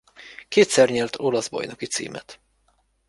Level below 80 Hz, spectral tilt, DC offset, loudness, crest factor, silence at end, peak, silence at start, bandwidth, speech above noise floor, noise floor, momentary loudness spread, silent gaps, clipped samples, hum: -62 dBFS; -3.5 dB/octave; under 0.1%; -22 LUFS; 20 dB; 0.75 s; -4 dBFS; 0.25 s; 11.5 kHz; 44 dB; -66 dBFS; 21 LU; none; under 0.1%; none